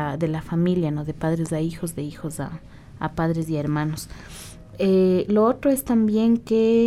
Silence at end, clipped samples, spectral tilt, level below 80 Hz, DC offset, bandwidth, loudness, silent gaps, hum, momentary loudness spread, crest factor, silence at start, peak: 0 s; under 0.1%; -7 dB/octave; -46 dBFS; under 0.1%; 15 kHz; -23 LUFS; none; none; 15 LU; 14 dB; 0 s; -8 dBFS